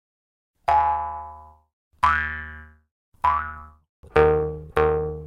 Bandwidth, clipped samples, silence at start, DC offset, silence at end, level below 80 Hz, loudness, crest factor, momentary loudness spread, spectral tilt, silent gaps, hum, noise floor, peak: 12 kHz; under 0.1%; 0.7 s; under 0.1%; 0 s; -42 dBFS; -23 LUFS; 20 dB; 18 LU; -7 dB/octave; 1.73-1.91 s, 2.91-3.12 s, 3.89-4.03 s; none; -43 dBFS; -4 dBFS